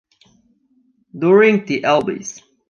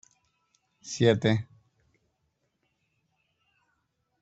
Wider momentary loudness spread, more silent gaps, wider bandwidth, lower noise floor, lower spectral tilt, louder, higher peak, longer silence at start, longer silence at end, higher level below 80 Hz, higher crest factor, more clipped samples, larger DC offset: second, 16 LU vs 25 LU; neither; second, 7.2 kHz vs 8.2 kHz; second, -60 dBFS vs -77 dBFS; about the same, -5.5 dB/octave vs -6 dB/octave; first, -15 LUFS vs -26 LUFS; first, -2 dBFS vs -8 dBFS; first, 1.15 s vs 0.85 s; second, 0.4 s vs 2.8 s; about the same, -64 dBFS vs -66 dBFS; second, 16 dB vs 24 dB; neither; neither